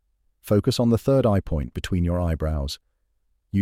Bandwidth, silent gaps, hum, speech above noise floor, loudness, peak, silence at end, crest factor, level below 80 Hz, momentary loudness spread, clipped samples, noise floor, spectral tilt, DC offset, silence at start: 16 kHz; none; none; 47 dB; -23 LUFS; -8 dBFS; 0 s; 16 dB; -34 dBFS; 9 LU; under 0.1%; -69 dBFS; -7 dB/octave; under 0.1%; 0.45 s